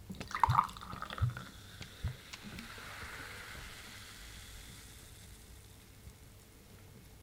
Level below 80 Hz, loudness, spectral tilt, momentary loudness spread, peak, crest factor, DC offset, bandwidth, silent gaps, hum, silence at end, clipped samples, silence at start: -54 dBFS; -40 LUFS; -4.5 dB/octave; 23 LU; -12 dBFS; 30 dB; under 0.1%; 17.5 kHz; none; none; 0 s; under 0.1%; 0 s